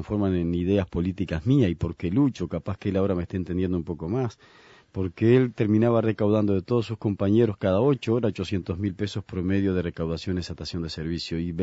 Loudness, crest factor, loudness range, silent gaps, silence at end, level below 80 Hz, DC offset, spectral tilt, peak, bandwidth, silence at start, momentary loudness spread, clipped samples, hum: -25 LUFS; 16 dB; 5 LU; none; 0 s; -48 dBFS; under 0.1%; -8 dB/octave; -8 dBFS; 8 kHz; 0 s; 9 LU; under 0.1%; none